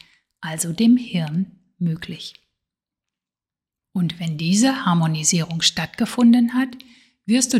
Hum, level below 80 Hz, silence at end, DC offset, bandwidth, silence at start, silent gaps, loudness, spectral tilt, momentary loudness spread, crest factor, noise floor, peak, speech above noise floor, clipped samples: none; -60 dBFS; 0 s; under 0.1%; 14.5 kHz; 0.4 s; none; -20 LUFS; -4 dB/octave; 14 LU; 20 dB; -90 dBFS; -2 dBFS; 71 dB; under 0.1%